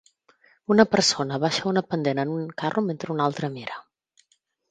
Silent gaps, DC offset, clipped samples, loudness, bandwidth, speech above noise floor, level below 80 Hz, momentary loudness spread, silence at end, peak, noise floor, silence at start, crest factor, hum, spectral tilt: none; under 0.1%; under 0.1%; -24 LUFS; 9.4 kHz; 45 dB; -66 dBFS; 15 LU; 0.9 s; -2 dBFS; -69 dBFS; 0.7 s; 24 dB; none; -4.5 dB/octave